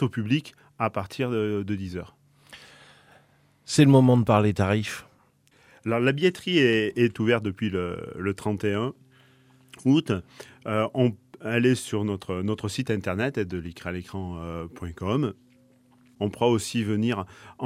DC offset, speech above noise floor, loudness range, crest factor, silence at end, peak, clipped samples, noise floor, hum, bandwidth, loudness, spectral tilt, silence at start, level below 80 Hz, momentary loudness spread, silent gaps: under 0.1%; 37 dB; 8 LU; 20 dB; 0 s; -6 dBFS; under 0.1%; -61 dBFS; none; 15 kHz; -25 LUFS; -6.5 dB/octave; 0 s; -56 dBFS; 14 LU; none